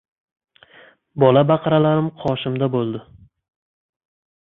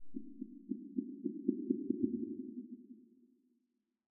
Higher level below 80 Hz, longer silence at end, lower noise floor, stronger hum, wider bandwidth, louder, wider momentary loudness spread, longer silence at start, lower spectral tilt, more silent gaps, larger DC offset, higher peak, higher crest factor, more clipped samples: first, -56 dBFS vs -80 dBFS; first, 1.4 s vs 0.65 s; second, -50 dBFS vs -83 dBFS; neither; first, 4.1 kHz vs 0.5 kHz; first, -18 LUFS vs -41 LUFS; second, 12 LU vs 16 LU; first, 1.15 s vs 0 s; first, -10 dB/octave vs 1.5 dB/octave; neither; neither; first, -2 dBFS vs -18 dBFS; second, 18 dB vs 24 dB; neither